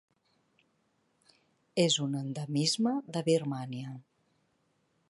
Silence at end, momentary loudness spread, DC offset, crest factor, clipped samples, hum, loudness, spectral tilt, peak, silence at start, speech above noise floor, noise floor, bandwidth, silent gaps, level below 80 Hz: 1.1 s; 13 LU; under 0.1%; 20 dB; under 0.1%; none; -31 LUFS; -4.5 dB/octave; -14 dBFS; 1.75 s; 44 dB; -74 dBFS; 11.5 kHz; none; -80 dBFS